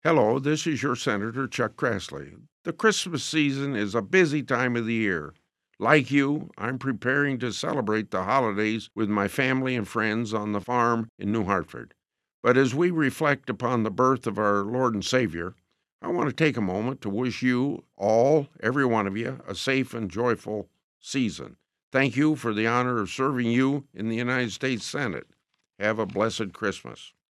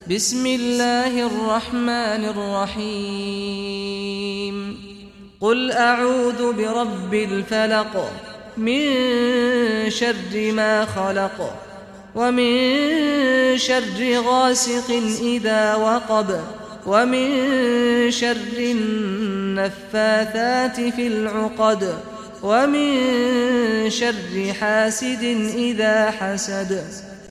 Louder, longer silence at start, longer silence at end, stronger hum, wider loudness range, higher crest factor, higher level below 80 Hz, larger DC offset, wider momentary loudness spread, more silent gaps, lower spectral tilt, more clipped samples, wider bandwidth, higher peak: second, -25 LUFS vs -20 LUFS; about the same, 0.05 s vs 0 s; first, 0.2 s vs 0 s; neither; about the same, 3 LU vs 4 LU; first, 22 dB vs 16 dB; second, -66 dBFS vs -54 dBFS; neither; about the same, 10 LU vs 9 LU; first, 2.52-2.64 s, 11.09-11.18 s, 12.34-12.43 s, 15.92-15.99 s, 20.84-21.00 s, 21.83-21.91 s vs none; first, -5.5 dB/octave vs -3.5 dB/octave; neither; about the same, 13.5 kHz vs 14.5 kHz; about the same, -4 dBFS vs -4 dBFS